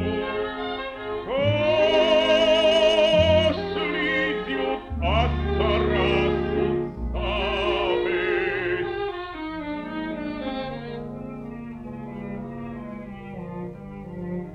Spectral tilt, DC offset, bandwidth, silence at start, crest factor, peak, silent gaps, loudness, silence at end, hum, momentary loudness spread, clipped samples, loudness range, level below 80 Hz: -6 dB/octave; under 0.1%; 9.2 kHz; 0 s; 16 dB; -8 dBFS; none; -23 LUFS; 0 s; none; 18 LU; under 0.1%; 14 LU; -38 dBFS